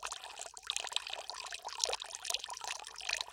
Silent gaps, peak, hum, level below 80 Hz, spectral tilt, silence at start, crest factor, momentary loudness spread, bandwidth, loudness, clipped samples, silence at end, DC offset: none; -8 dBFS; none; -72 dBFS; 2.5 dB/octave; 0 s; 34 dB; 7 LU; 17 kHz; -39 LUFS; under 0.1%; 0 s; under 0.1%